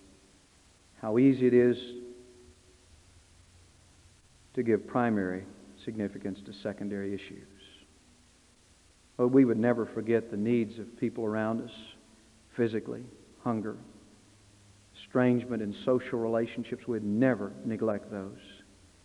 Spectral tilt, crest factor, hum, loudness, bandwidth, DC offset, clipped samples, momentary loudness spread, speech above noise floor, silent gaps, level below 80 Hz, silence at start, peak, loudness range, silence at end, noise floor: -8 dB/octave; 20 dB; none; -30 LUFS; 11 kHz; under 0.1%; under 0.1%; 20 LU; 32 dB; none; -68 dBFS; 1 s; -12 dBFS; 8 LU; 0.5 s; -62 dBFS